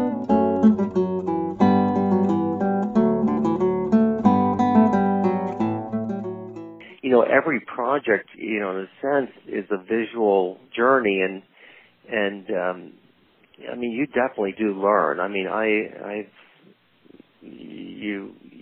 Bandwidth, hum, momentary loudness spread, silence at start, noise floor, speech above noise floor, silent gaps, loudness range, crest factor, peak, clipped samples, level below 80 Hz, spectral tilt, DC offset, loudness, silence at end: 6.8 kHz; none; 15 LU; 0 s; -58 dBFS; 34 dB; none; 7 LU; 18 dB; -4 dBFS; under 0.1%; -56 dBFS; -8.5 dB/octave; under 0.1%; -22 LUFS; 0 s